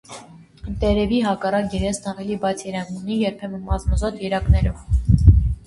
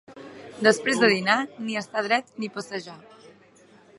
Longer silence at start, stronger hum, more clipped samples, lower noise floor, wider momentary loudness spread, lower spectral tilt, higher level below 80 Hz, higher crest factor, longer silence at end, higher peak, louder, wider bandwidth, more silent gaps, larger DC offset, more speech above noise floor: about the same, 0.1 s vs 0.1 s; neither; neither; second, -42 dBFS vs -54 dBFS; second, 13 LU vs 22 LU; first, -7 dB/octave vs -3.5 dB/octave; first, -24 dBFS vs -76 dBFS; about the same, 20 dB vs 24 dB; second, 0.05 s vs 1 s; about the same, 0 dBFS vs -2 dBFS; first, -21 LUFS vs -24 LUFS; about the same, 11.5 kHz vs 11.5 kHz; neither; neither; second, 21 dB vs 30 dB